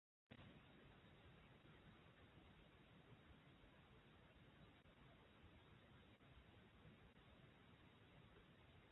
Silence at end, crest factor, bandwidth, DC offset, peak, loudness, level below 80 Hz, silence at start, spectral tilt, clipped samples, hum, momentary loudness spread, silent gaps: 0 s; 20 dB; 3.9 kHz; under 0.1%; -50 dBFS; -69 LUFS; -78 dBFS; 0.3 s; -4.5 dB/octave; under 0.1%; none; 2 LU; none